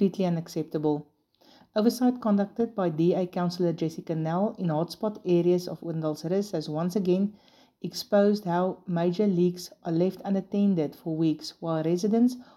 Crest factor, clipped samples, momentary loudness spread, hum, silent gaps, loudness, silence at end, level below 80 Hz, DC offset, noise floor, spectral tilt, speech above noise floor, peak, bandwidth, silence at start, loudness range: 18 dB; under 0.1%; 8 LU; none; none; -27 LUFS; 0.15 s; -72 dBFS; under 0.1%; -59 dBFS; -7.5 dB/octave; 33 dB; -10 dBFS; 13.5 kHz; 0 s; 1 LU